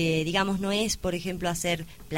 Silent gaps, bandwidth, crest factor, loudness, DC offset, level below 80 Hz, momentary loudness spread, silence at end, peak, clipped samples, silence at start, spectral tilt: none; 16.5 kHz; 16 dB; -28 LUFS; 0.3%; -48 dBFS; 5 LU; 0 s; -12 dBFS; under 0.1%; 0 s; -4 dB/octave